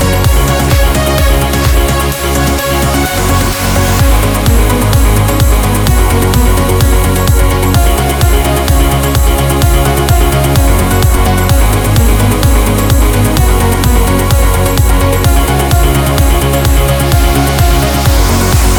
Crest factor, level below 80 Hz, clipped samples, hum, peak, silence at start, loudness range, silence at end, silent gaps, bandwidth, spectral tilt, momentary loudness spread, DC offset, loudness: 8 dB; -12 dBFS; 0.3%; none; 0 dBFS; 0 s; 1 LU; 0 s; none; over 20 kHz; -5 dB/octave; 1 LU; under 0.1%; -10 LUFS